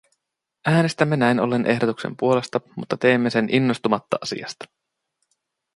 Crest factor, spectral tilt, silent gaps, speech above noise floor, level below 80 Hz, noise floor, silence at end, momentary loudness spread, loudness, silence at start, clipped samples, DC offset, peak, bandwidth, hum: 20 dB; -6 dB/octave; none; 60 dB; -64 dBFS; -81 dBFS; 1.1 s; 11 LU; -21 LUFS; 0.65 s; under 0.1%; under 0.1%; -2 dBFS; 11.5 kHz; none